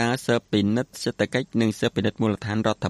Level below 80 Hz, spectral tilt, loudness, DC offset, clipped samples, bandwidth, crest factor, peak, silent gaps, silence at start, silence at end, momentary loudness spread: -56 dBFS; -5.5 dB/octave; -24 LUFS; under 0.1%; under 0.1%; 13.5 kHz; 18 dB; -6 dBFS; none; 0 s; 0 s; 3 LU